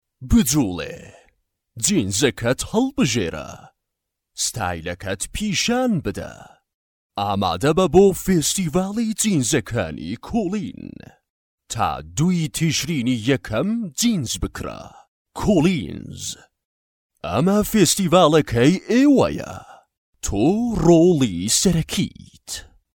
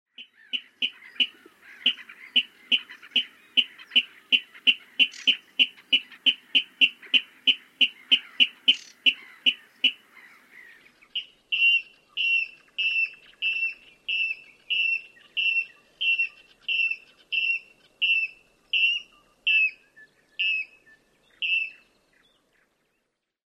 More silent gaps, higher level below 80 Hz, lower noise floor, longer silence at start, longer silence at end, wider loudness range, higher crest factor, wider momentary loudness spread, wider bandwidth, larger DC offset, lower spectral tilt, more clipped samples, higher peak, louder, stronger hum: first, 6.74-7.10 s, 11.30-11.58 s, 15.08-15.25 s, 16.65-17.09 s, 19.98-20.13 s vs none; first, -40 dBFS vs -80 dBFS; about the same, -81 dBFS vs -78 dBFS; about the same, 0.2 s vs 0.2 s; second, 0.35 s vs 1.85 s; about the same, 6 LU vs 5 LU; about the same, 20 dB vs 22 dB; first, 17 LU vs 11 LU; first, 18 kHz vs 12.5 kHz; neither; first, -4.5 dB/octave vs 1 dB/octave; neither; first, -2 dBFS vs -6 dBFS; first, -20 LUFS vs -24 LUFS; neither